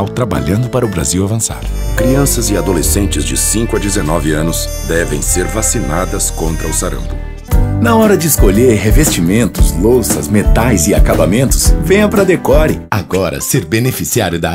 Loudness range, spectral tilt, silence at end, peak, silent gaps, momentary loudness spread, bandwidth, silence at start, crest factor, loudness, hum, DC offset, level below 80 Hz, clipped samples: 4 LU; -5 dB/octave; 0 s; 0 dBFS; none; 6 LU; 16.5 kHz; 0 s; 12 dB; -12 LUFS; none; under 0.1%; -18 dBFS; under 0.1%